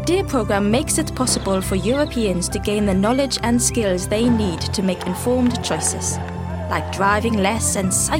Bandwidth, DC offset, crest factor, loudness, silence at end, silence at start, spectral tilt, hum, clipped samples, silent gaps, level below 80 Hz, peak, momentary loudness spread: 17 kHz; under 0.1%; 14 dB; -19 LUFS; 0 s; 0 s; -4.5 dB/octave; none; under 0.1%; none; -36 dBFS; -4 dBFS; 5 LU